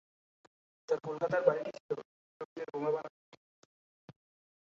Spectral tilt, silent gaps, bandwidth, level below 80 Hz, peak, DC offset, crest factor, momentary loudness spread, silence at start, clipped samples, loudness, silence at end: -5 dB/octave; 1.80-1.89 s, 2.05-2.56 s, 3.10-4.08 s; 7.6 kHz; -82 dBFS; -12 dBFS; under 0.1%; 26 dB; 18 LU; 0.9 s; under 0.1%; -35 LUFS; 0.55 s